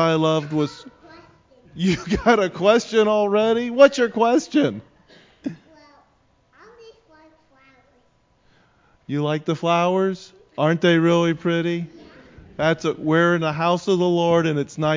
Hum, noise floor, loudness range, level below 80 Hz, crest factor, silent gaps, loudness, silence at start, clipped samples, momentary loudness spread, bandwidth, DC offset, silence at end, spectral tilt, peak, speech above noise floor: none; -61 dBFS; 9 LU; -52 dBFS; 20 dB; none; -20 LUFS; 0 s; under 0.1%; 13 LU; 7.6 kHz; under 0.1%; 0 s; -6 dB/octave; 0 dBFS; 42 dB